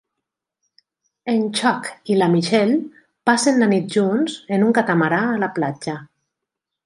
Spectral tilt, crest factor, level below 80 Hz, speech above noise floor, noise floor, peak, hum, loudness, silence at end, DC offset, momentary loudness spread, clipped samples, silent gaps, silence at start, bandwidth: -5 dB/octave; 18 dB; -68 dBFS; 64 dB; -83 dBFS; -2 dBFS; none; -19 LUFS; 0.8 s; under 0.1%; 10 LU; under 0.1%; none; 1.25 s; 11.5 kHz